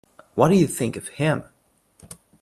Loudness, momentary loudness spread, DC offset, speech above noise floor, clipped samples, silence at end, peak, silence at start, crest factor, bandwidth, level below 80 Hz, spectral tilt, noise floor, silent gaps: -22 LUFS; 11 LU; under 0.1%; 40 dB; under 0.1%; 1 s; -2 dBFS; 0.35 s; 22 dB; 13.5 kHz; -56 dBFS; -6 dB/octave; -60 dBFS; none